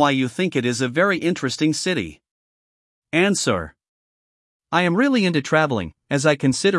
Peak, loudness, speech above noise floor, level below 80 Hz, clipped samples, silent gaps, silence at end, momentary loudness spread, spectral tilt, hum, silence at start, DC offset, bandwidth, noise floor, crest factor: -4 dBFS; -20 LUFS; over 71 dB; -56 dBFS; under 0.1%; 2.31-3.02 s, 3.89-4.60 s; 0 s; 8 LU; -4.5 dB/octave; none; 0 s; under 0.1%; 12 kHz; under -90 dBFS; 18 dB